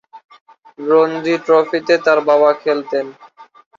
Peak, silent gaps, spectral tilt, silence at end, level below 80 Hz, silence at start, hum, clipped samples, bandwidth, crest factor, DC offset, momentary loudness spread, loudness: -2 dBFS; 0.25-0.29 s, 0.41-0.46 s; -5.5 dB/octave; 0.35 s; -66 dBFS; 0.15 s; none; under 0.1%; 7.4 kHz; 14 dB; under 0.1%; 10 LU; -15 LUFS